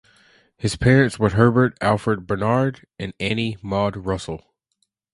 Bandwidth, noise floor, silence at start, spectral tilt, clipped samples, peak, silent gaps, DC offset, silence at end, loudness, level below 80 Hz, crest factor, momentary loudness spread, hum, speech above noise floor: 11.5 kHz; -72 dBFS; 0.6 s; -6.5 dB/octave; under 0.1%; 0 dBFS; none; under 0.1%; 0.75 s; -20 LUFS; -44 dBFS; 20 dB; 12 LU; none; 52 dB